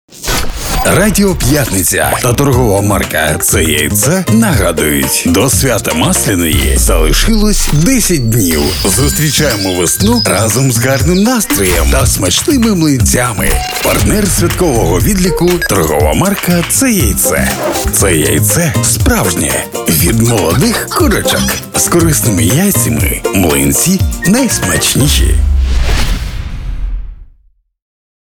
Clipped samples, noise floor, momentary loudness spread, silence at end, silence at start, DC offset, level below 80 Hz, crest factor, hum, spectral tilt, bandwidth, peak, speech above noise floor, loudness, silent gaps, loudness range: under 0.1%; -50 dBFS; 4 LU; 1 s; 0.1 s; under 0.1%; -18 dBFS; 10 dB; none; -4 dB/octave; over 20 kHz; 0 dBFS; 40 dB; -10 LUFS; none; 1 LU